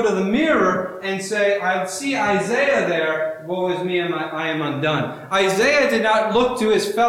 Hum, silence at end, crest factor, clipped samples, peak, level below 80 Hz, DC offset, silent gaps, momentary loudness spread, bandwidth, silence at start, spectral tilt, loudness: none; 0 s; 12 dB; under 0.1%; -6 dBFS; -54 dBFS; under 0.1%; none; 7 LU; 16.5 kHz; 0 s; -4.5 dB/octave; -19 LUFS